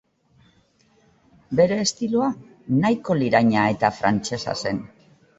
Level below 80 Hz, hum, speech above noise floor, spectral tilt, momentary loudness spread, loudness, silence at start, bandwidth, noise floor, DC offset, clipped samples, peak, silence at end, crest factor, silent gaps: -56 dBFS; none; 39 dB; -5 dB/octave; 9 LU; -22 LUFS; 1.5 s; 8 kHz; -60 dBFS; under 0.1%; under 0.1%; -4 dBFS; 0.5 s; 20 dB; none